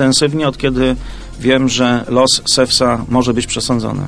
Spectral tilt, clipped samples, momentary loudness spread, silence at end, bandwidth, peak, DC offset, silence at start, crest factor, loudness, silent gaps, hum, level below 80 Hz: -4 dB/octave; under 0.1%; 6 LU; 0 s; 11 kHz; 0 dBFS; under 0.1%; 0 s; 14 dB; -14 LUFS; none; none; -32 dBFS